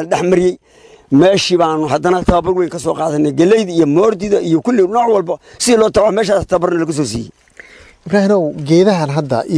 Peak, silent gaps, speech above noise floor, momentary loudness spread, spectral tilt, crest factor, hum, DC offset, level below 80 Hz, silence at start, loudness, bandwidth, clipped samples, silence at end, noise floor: 0 dBFS; none; 27 dB; 7 LU; -5.5 dB/octave; 12 dB; none; under 0.1%; -38 dBFS; 0 s; -13 LUFS; 11 kHz; under 0.1%; 0 s; -40 dBFS